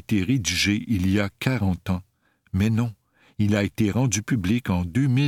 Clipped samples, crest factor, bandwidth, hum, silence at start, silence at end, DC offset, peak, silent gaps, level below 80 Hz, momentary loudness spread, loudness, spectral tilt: under 0.1%; 18 dB; 16.5 kHz; none; 0.1 s; 0 s; under 0.1%; -6 dBFS; none; -48 dBFS; 7 LU; -24 LUFS; -5.5 dB/octave